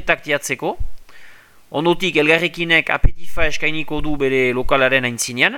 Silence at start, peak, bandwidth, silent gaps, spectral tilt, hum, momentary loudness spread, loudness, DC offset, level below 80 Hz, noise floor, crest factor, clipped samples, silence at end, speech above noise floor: 0 s; 0 dBFS; 16.5 kHz; none; -4 dB/octave; none; 10 LU; -18 LUFS; under 0.1%; -28 dBFS; -41 dBFS; 18 dB; under 0.1%; 0 s; 25 dB